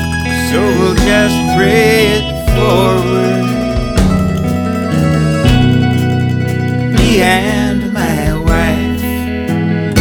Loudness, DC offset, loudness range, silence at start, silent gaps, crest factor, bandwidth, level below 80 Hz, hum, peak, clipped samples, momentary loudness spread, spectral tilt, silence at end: -12 LUFS; under 0.1%; 2 LU; 0 s; none; 12 dB; 19.5 kHz; -22 dBFS; none; 0 dBFS; under 0.1%; 6 LU; -6 dB/octave; 0 s